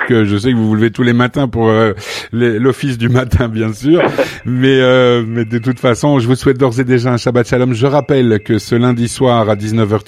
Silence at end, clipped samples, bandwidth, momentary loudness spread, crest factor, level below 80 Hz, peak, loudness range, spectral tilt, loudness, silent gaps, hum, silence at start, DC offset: 0.05 s; under 0.1%; 14 kHz; 4 LU; 12 dB; -36 dBFS; 0 dBFS; 1 LU; -6.5 dB/octave; -12 LUFS; none; none; 0 s; 0.1%